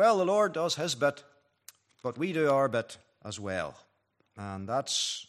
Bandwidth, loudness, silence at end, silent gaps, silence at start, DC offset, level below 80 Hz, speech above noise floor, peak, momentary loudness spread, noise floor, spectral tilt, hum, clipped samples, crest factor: 14.5 kHz; -30 LUFS; 0.05 s; none; 0 s; under 0.1%; -76 dBFS; 35 dB; -14 dBFS; 17 LU; -65 dBFS; -3.5 dB/octave; none; under 0.1%; 18 dB